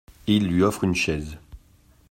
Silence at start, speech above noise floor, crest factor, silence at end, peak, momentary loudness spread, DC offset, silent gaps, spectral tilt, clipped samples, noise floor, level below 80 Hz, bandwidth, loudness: 0.25 s; 34 dB; 16 dB; 0.55 s; -8 dBFS; 16 LU; under 0.1%; none; -5.5 dB/octave; under 0.1%; -56 dBFS; -46 dBFS; 16 kHz; -23 LUFS